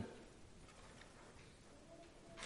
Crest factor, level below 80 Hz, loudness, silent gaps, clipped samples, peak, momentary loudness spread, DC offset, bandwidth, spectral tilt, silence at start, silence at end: 22 dB; -68 dBFS; -60 LUFS; none; under 0.1%; -34 dBFS; 3 LU; under 0.1%; 11.5 kHz; -4 dB/octave; 0 s; 0 s